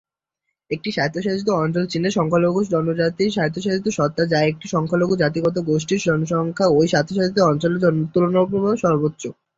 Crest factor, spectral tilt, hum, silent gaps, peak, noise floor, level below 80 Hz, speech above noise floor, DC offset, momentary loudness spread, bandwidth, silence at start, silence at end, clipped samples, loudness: 16 dB; -6 dB/octave; none; none; -4 dBFS; -79 dBFS; -56 dBFS; 60 dB; under 0.1%; 5 LU; 7.8 kHz; 0.7 s; 0.25 s; under 0.1%; -20 LUFS